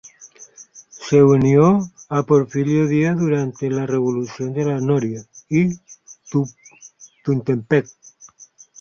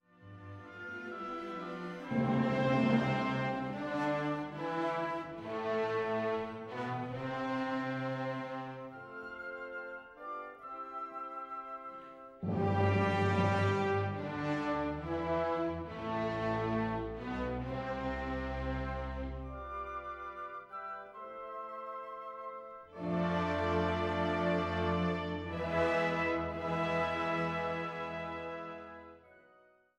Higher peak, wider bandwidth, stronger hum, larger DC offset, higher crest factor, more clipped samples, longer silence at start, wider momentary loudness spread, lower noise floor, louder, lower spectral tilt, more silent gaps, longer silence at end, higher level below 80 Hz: first, -2 dBFS vs -18 dBFS; second, 7.2 kHz vs 9.8 kHz; neither; neither; about the same, 18 dB vs 18 dB; neither; about the same, 0.2 s vs 0.2 s; about the same, 15 LU vs 14 LU; second, -48 dBFS vs -65 dBFS; first, -19 LUFS vs -36 LUFS; about the same, -7.5 dB/octave vs -7.5 dB/octave; neither; first, 1 s vs 0.6 s; about the same, -54 dBFS vs -54 dBFS